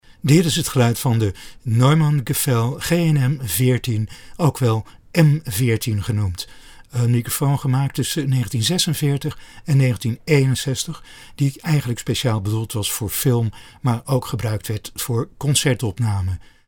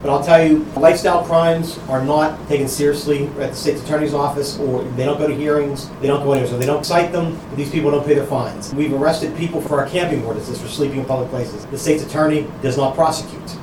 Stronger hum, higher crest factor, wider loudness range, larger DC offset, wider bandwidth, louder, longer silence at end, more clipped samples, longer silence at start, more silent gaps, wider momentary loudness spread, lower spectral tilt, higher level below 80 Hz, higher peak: neither; about the same, 18 dB vs 18 dB; about the same, 3 LU vs 4 LU; neither; about the same, 19.5 kHz vs 18.5 kHz; about the same, -20 LUFS vs -18 LUFS; first, 0.25 s vs 0 s; neither; first, 0.25 s vs 0 s; neither; about the same, 9 LU vs 9 LU; about the same, -5.5 dB/octave vs -6 dB/octave; about the same, -46 dBFS vs -44 dBFS; about the same, 0 dBFS vs 0 dBFS